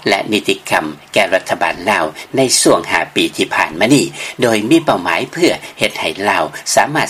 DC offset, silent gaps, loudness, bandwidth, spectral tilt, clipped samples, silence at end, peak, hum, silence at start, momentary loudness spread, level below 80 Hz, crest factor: under 0.1%; none; -14 LUFS; 16 kHz; -3 dB/octave; under 0.1%; 0 s; 0 dBFS; none; 0 s; 6 LU; -52 dBFS; 14 dB